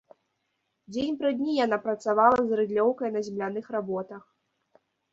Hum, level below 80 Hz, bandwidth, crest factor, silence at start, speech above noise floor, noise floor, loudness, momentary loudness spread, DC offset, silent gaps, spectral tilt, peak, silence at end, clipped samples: none; -66 dBFS; 7.8 kHz; 22 dB; 0.9 s; 52 dB; -78 dBFS; -27 LUFS; 13 LU; under 0.1%; none; -6 dB/octave; -6 dBFS; 0.95 s; under 0.1%